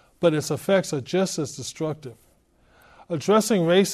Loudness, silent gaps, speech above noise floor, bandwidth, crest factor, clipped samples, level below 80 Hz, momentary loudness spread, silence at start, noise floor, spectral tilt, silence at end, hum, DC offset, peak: -23 LUFS; none; 38 dB; 14.5 kHz; 18 dB; under 0.1%; -62 dBFS; 12 LU; 0.2 s; -60 dBFS; -5 dB/octave; 0 s; none; under 0.1%; -6 dBFS